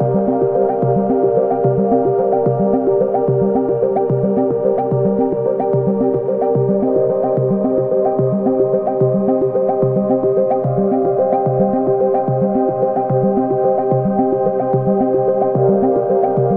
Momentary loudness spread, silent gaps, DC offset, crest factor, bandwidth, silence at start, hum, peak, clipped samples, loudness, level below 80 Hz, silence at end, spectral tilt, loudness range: 1 LU; none; under 0.1%; 14 dB; 2.6 kHz; 0 s; none; -2 dBFS; under 0.1%; -16 LUFS; -48 dBFS; 0 s; -13.5 dB/octave; 1 LU